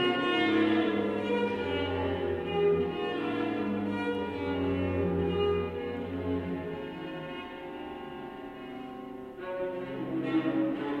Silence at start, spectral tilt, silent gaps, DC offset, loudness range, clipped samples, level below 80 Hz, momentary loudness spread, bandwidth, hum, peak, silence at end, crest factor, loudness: 0 s; -7.5 dB/octave; none; under 0.1%; 10 LU; under 0.1%; -56 dBFS; 14 LU; 9.4 kHz; none; -16 dBFS; 0 s; 16 dB; -31 LUFS